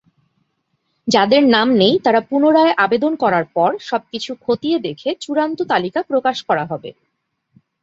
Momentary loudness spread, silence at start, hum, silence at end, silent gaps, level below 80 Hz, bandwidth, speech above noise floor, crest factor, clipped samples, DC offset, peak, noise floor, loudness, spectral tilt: 12 LU; 1.05 s; none; 0.9 s; none; -60 dBFS; 8 kHz; 55 dB; 16 dB; under 0.1%; under 0.1%; 0 dBFS; -71 dBFS; -16 LUFS; -5 dB/octave